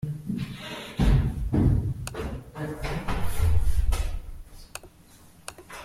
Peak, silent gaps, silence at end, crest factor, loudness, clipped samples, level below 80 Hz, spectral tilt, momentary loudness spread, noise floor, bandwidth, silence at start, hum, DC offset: -10 dBFS; none; 0 s; 16 dB; -28 LUFS; under 0.1%; -30 dBFS; -6.5 dB/octave; 19 LU; -53 dBFS; 15.5 kHz; 0.05 s; none; under 0.1%